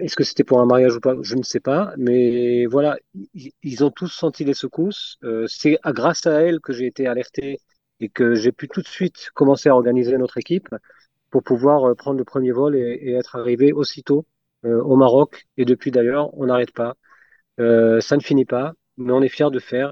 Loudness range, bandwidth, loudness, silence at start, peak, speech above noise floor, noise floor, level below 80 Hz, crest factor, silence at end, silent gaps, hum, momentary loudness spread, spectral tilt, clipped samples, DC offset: 3 LU; 7.6 kHz; -19 LUFS; 0 s; -2 dBFS; 36 dB; -54 dBFS; -66 dBFS; 18 dB; 0 s; none; none; 14 LU; -6.5 dB/octave; under 0.1%; under 0.1%